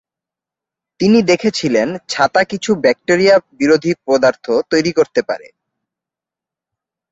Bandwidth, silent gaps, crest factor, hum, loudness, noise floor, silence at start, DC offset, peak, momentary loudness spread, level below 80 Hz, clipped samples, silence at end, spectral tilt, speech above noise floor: 8 kHz; none; 16 dB; none; -14 LUFS; -87 dBFS; 1 s; under 0.1%; 0 dBFS; 7 LU; -56 dBFS; under 0.1%; 1.75 s; -5 dB/octave; 73 dB